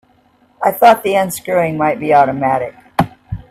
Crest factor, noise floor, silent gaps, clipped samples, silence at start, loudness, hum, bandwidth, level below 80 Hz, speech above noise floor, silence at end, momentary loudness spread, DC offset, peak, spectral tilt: 14 dB; -53 dBFS; none; under 0.1%; 0.6 s; -14 LUFS; none; 16 kHz; -44 dBFS; 40 dB; 0.15 s; 10 LU; under 0.1%; 0 dBFS; -5.5 dB/octave